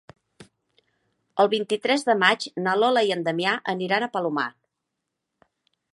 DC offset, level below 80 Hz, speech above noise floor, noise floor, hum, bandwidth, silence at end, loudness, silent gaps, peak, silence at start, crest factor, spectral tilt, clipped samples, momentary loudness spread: under 0.1%; -76 dBFS; 59 dB; -82 dBFS; none; 11.5 kHz; 1.45 s; -23 LUFS; none; -2 dBFS; 0.4 s; 22 dB; -4 dB/octave; under 0.1%; 7 LU